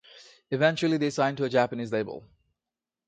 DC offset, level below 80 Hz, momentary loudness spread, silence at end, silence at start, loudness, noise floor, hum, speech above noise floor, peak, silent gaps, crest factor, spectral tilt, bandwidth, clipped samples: under 0.1%; -68 dBFS; 11 LU; 0.9 s; 0.15 s; -27 LUFS; -90 dBFS; none; 64 dB; -10 dBFS; none; 18 dB; -6 dB/octave; 9.2 kHz; under 0.1%